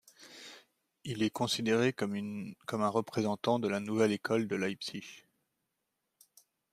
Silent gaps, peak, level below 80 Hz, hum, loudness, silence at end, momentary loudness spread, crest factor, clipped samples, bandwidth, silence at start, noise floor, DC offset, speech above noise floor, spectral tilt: none; -14 dBFS; -76 dBFS; none; -33 LUFS; 1.55 s; 19 LU; 20 dB; under 0.1%; 15.5 kHz; 0.2 s; -84 dBFS; under 0.1%; 52 dB; -5 dB/octave